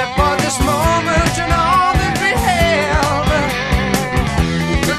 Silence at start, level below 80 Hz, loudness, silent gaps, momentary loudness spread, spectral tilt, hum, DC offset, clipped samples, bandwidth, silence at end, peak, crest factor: 0 s; -24 dBFS; -15 LUFS; none; 3 LU; -4.5 dB/octave; none; under 0.1%; under 0.1%; 14 kHz; 0 s; 0 dBFS; 14 dB